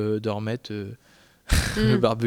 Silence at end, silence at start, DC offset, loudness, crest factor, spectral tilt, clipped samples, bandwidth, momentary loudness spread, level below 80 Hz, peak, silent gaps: 0 s; 0 s; under 0.1%; -25 LUFS; 20 dB; -5.5 dB/octave; under 0.1%; 17.5 kHz; 14 LU; -34 dBFS; -6 dBFS; none